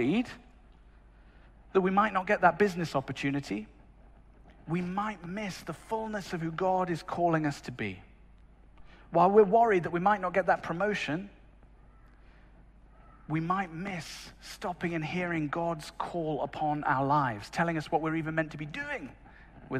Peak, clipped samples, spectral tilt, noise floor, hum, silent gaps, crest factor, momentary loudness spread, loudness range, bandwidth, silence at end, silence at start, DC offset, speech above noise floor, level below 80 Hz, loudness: -10 dBFS; under 0.1%; -6.5 dB/octave; -56 dBFS; none; none; 22 dB; 13 LU; 9 LU; 14 kHz; 0 s; 0 s; under 0.1%; 26 dB; -56 dBFS; -30 LUFS